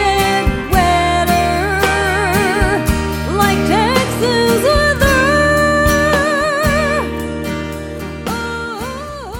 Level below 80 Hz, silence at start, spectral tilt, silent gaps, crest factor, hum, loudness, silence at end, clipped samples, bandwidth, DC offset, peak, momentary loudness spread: -26 dBFS; 0 s; -4.5 dB/octave; none; 14 dB; none; -14 LUFS; 0 s; under 0.1%; 17.5 kHz; under 0.1%; 0 dBFS; 11 LU